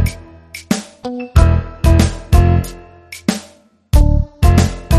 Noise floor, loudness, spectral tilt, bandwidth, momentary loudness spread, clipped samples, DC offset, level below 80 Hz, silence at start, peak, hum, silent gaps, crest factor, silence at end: -46 dBFS; -15 LUFS; -6.5 dB/octave; 13.5 kHz; 16 LU; under 0.1%; under 0.1%; -18 dBFS; 0 s; 0 dBFS; none; none; 14 dB; 0 s